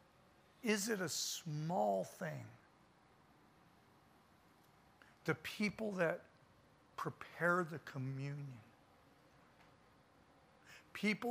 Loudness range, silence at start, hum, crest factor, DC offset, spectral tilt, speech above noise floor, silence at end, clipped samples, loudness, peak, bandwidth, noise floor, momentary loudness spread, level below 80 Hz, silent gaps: 10 LU; 0.65 s; none; 22 dB; under 0.1%; -4.5 dB/octave; 29 dB; 0 s; under 0.1%; -41 LUFS; -22 dBFS; 15.5 kHz; -69 dBFS; 16 LU; -80 dBFS; none